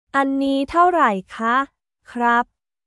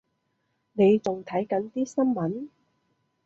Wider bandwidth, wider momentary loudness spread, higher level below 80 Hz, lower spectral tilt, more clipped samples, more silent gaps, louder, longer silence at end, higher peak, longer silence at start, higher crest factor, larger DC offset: first, 12 kHz vs 8 kHz; second, 13 LU vs 16 LU; first, -54 dBFS vs -70 dBFS; second, -5.5 dB/octave vs -7.5 dB/octave; neither; neither; first, -19 LUFS vs -25 LUFS; second, 0.45 s vs 0.8 s; first, -4 dBFS vs -10 dBFS; second, 0.15 s vs 0.75 s; about the same, 16 dB vs 16 dB; neither